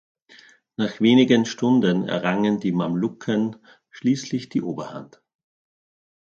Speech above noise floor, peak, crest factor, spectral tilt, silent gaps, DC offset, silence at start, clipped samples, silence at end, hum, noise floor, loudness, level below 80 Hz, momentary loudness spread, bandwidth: 31 dB; -4 dBFS; 18 dB; -6 dB/octave; none; under 0.1%; 0.8 s; under 0.1%; 1.2 s; none; -52 dBFS; -22 LUFS; -66 dBFS; 13 LU; 7.4 kHz